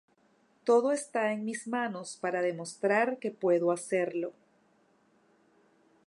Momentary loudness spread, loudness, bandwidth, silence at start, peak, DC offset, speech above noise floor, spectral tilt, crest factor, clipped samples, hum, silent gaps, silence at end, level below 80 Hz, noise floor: 10 LU; -30 LUFS; 11.5 kHz; 0.65 s; -14 dBFS; under 0.1%; 38 dB; -5 dB/octave; 18 dB; under 0.1%; none; none; 1.75 s; -88 dBFS; -68 dBFS